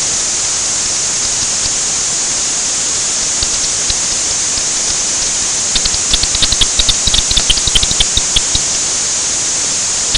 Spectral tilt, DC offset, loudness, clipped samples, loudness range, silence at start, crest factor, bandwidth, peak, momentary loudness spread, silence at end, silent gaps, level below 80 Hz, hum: 0.5 dB/octave; under 0.1%; -11 LUFS; under 0.1%; 2 LU; 0 s; 14 dB; 16.5 kHz; 0 dBFS; 3 LU; 0 s; none; -28 dBFS; none